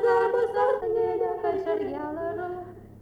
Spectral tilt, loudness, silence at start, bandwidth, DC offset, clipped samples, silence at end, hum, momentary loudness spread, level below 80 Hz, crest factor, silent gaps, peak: -7 dB/octave; -27 LUFS; 0 s; 9.6 kHz; under 0.1%; under 0.1%; 0 s; none; 11 LU; -58 dBFS; 14 dB; none; -12 dBFS